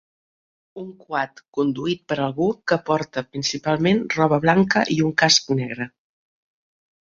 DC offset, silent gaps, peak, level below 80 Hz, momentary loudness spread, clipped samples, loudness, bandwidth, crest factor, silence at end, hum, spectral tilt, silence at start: under 0.1%; 1.48-1.52 s; -2 dBFS; -58 dBFS; 12 LU; under 0.1%; -21 LUFS; 7.6 kHz; 20 dB; 1.15 s; none; -4.5 dB/octave; 0.75 s